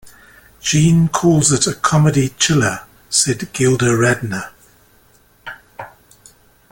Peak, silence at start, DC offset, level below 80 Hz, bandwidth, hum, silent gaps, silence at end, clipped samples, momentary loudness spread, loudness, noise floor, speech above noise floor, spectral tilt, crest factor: 0 dBFS; 0.05 s; under 0.1%; -44 dBFS; 17 kHz; none; none; 0.85 s; under 0.1%; 21 LU; -15 LUFS; -52 dBFS; 38 dB; -4.5 dB/octave; 18 dB